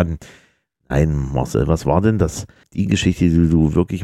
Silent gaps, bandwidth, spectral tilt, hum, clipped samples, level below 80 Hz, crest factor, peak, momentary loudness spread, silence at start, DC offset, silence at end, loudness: none; 13 kHz; -7 dB/octave; none; under 0.1%; -30 dBFS; 16 dB; -2 dBFS; 9 LU; 0 s; under 0.1%; 0 s; -18 LUFS